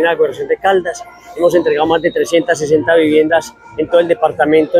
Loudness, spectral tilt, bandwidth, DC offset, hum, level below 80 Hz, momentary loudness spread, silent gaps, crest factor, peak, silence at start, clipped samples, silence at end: -13 LUFS; -4.5 dB/octave; 14.5 kHz; under 0.1%; none; -50 dBFS; 10 LU; none; 12 dB; 0 dBFS; 0 s; under 0.1%; 0 s